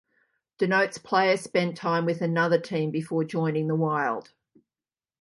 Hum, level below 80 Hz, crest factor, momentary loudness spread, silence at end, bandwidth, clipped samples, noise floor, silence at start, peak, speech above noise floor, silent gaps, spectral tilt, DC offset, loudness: none; -74 dBFS; 20 dB; 5 LU; 1 s; 11.5 kHz; under 0.1%; under -90 dBFS; 0.6 s; -8 dBFS; over 65 dB; none; -6 dB/octave; under 0.1%; -26 LUFS